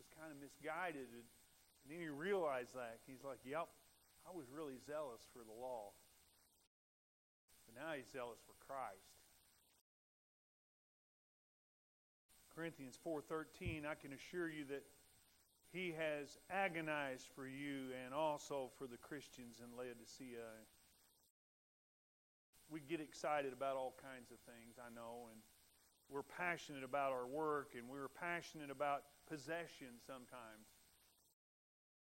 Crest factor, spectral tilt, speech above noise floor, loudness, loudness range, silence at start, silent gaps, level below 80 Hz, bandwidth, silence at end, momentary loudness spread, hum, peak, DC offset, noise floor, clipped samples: 24 dB; -4.5 dB/octave; 26 dB; -48 LUFS; 10 LU; 0 s; 6.67-7.48 s, 9.81-12.29 s, 21.30-22.53 s; -78 dBFS; 16 kHz; 1.35 s; 16 LU; none; -26 dBFS; under 0.1%; -75 dBFS; under 0.1%